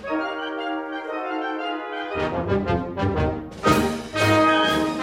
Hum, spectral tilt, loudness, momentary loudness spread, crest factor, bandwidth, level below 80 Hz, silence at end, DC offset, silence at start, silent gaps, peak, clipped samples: none; -5.5 dB/octave; -23 LUFS; 11 LU; 18 dB; 16.5 kHz; -42 dBFS; 0 s; under 0.1%; 0 s; none; -6 dBFS; under 0.1%